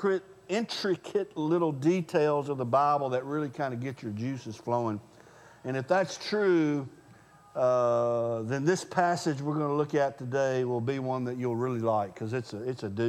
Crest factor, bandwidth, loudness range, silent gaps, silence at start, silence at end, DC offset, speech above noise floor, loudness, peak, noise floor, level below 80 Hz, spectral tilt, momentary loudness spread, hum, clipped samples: 18 dB; 13 kHz; 3 LU; none; 0 s; 0 s; under 0.1%; 27 dB; -29 LUFS; -10 dBFS; -56 dBFS; -74 dBFS; -6.5 dB/octave; 9 LU; none; under 0.1%